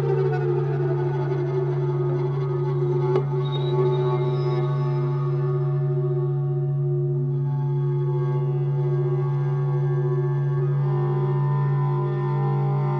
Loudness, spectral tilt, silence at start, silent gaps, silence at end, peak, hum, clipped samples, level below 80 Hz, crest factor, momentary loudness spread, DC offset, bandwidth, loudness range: -23 LUFS; -10.5 dB/octave; 0 s; none; 0 s; -10 dBFS; 50 Hz at -50 dBFS; under 0.1%; -54 dBFS; 12 dB; 2 LU; under 0.1%; 4.9 kHz; 1 LU